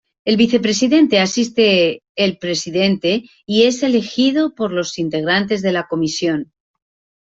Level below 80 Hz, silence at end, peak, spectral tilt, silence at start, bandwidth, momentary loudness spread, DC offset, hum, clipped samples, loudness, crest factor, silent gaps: -58 dBFS; 0.75 s; -2 dBFS; -4.5 dB/octave; 0.25 s; 8 kHz; 8 LU; under 0.1%; none; under 0.1%; -16 LUFS; 14 dB; 2.09-2.15 s